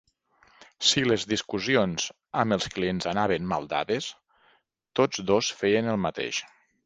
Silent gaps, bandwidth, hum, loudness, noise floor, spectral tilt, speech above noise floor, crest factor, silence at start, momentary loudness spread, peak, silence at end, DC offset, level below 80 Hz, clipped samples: none; 10 kHz; none; -26 LUFS; -66 dBFS; -4 dB/octave; 40 dB; 20 dB; 0.8 s; 7 LU; -6 dBFS; 0.4 s; under 0.1%; -58 dBFS; under 0.1%